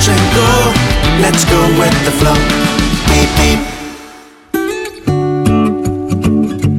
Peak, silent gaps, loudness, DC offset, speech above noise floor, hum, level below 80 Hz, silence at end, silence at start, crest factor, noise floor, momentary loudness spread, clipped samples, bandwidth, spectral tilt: 0 dBFS; none; -11 LUFS; under 0.1%; 26 dB; none; -20 dBFS; 0 s; 0 s; 12 dB; -36 dBFS; 10 LU; under 0.1%; 17.5 kHz; -4.5 dB/octave